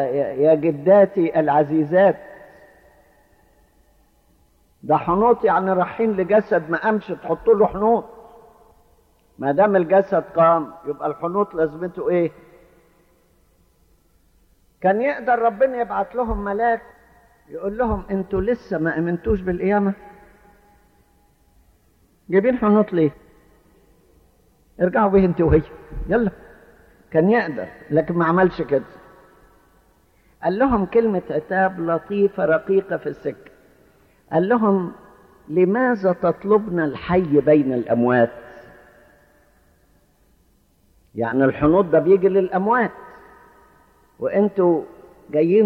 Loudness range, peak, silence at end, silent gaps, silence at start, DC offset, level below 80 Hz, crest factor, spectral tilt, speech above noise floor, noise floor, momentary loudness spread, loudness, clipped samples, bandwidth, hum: 6 LU; -4 dBFS; 0 s; none; 0 s; under 0.1%; -44 dBFS; 16 dB; -9.5 dB/octave; 41 dB; -59 dBFS; 10 LU; -19 LUFS; under 0.1%; 5.8 kHz; none